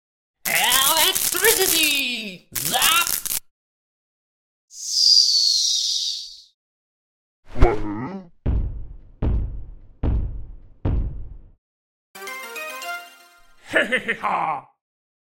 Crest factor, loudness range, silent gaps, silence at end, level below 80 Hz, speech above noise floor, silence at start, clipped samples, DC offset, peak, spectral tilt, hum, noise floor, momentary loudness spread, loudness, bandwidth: 22 dB; 13 LU; 3.51-4.68 s, 6.54-7.43 s, 11.58-12.14 s; 0.75 s; -32 dBFS; 28 dB; 0.45 s; under 0.1%; under 0.1%; 0 dBFS; -1.5 dB/octave; none; -50 dBFS; 19 LU; -19 LUFS; 17 kHz